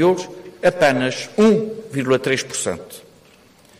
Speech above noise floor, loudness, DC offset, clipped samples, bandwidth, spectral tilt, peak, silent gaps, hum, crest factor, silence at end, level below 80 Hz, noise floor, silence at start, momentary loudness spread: 32 dB; -19 LUFS; under 0.1%; under 0.1%; 15.5 kHz; -4.5 dB/octave; -6 dBFS; none; none; 14 dB; 0.8 s; -54 dBFS; -50 dBFS; 0 s; 17 LU